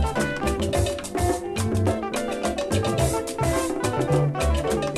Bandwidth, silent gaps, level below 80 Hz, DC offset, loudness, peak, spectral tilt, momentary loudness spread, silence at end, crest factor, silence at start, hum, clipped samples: 15 kHz; none; -34 dBFS; under 0.1%; -24 LUFS; -10 dBFS; -5.5 dB/octave; 4 LU; 0 s; 14 dB; 0 s; none; under 0.1%